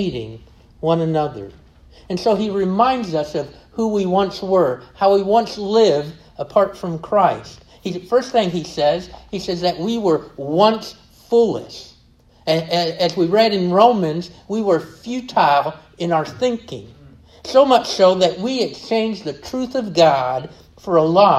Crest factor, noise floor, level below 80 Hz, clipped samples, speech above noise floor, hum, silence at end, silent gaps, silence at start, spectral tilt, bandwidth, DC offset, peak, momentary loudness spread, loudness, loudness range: 18 dB; -51 dBFS; -52 dBFS; under 0.1%; 34 dB; none; 0 s; none; 0 s; -5.5 dB/octave; 13.5 kHz; under 0.1%; 0 dBFS; 14 LU; -18 LUFS; 3 LU